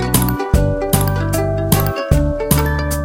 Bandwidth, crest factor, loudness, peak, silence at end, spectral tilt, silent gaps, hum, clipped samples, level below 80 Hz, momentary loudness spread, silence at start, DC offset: 17 kHz; 16 dB; -16 LUFS; 0 dBFS; 0 s; -5.5 dB/octave; none; none; under 0.1%; -22 dBFS; 2 LU; 0 s; under 0.1%